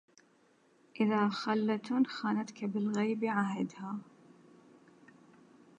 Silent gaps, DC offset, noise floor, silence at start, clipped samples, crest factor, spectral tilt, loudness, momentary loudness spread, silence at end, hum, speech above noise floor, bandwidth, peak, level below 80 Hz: none; under 0.1%; -68 dBFS; 0.95 s; under 0.1%; 18 dB; -6.5 dB/octave; -33 LUFS; 10 LU; 1.75 s; none; 35 dB; 8.6 kHz; -18 dBFS; -86 dBFS